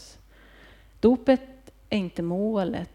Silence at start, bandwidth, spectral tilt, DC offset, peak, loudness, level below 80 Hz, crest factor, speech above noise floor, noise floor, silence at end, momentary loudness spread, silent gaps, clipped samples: 0 s; 11 kHz; -7.5 dB/octave; under 0.1%; -8 dBFS; -25 LUFS; -52 dBFS; 20 dB; 28 dB; -52 dBFS; 0.05 s; 8 LU; none; under 0.1%